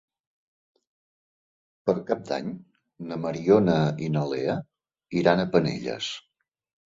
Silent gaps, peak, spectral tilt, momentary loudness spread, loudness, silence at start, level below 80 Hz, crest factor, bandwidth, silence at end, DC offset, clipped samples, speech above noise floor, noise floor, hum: none; -4 dBFS; -6.5 dB/octave; 14 LU; -26 LUFS; 1.85 s; -60 dBFS; 24 dB; 7.8 kHz; 0.7 s; under 0.1%; under 0.1%; over 66 dB; under -90 dBFS; none